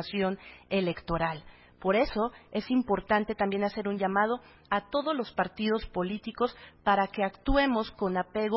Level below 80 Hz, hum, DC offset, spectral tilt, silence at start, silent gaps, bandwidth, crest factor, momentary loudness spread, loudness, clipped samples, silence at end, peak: -48 dBFS; none; under 0.1%; -10 dB/octave; 0 s; none; 5.8 kHz; 18 dB; 6 LU; -30 LUFS; under 0.1%; 0 s; -12 dBFS